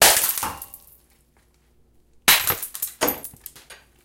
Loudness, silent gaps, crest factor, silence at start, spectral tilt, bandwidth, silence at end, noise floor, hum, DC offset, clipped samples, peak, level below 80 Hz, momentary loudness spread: -20 LUFS; none; 24 dB; 0 s; 0 dB/octave; 17 kHz; 0.3 s; -60 dBFS; none; under 0.1%; under 0.1%; 0 dBFS; -52 dBFS; 23 LU